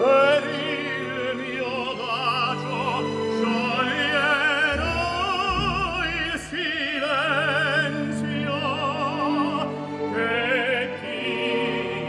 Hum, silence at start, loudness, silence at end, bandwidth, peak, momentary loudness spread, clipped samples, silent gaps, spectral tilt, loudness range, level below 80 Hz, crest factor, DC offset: none; 0 s; -23 LUFS; 0 s; 12 kHz; -6 dBFS; 7 LU; under 0.1%; none; -5 dB/octave; 2 LU; -46 dBFS; 18 dB; under 0.1%